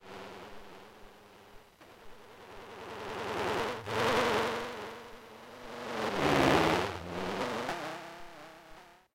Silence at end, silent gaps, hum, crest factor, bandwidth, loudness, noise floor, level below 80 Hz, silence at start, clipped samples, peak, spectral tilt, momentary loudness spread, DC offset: 0.2 s; none; none; 26 dB; 16 kHz; -32 LUFS; -55 dBFS; -58 dBFS; 0 s; under 0.1%; -10 dBFS; -4.5 dB/octave; 25 LU; under 0.1%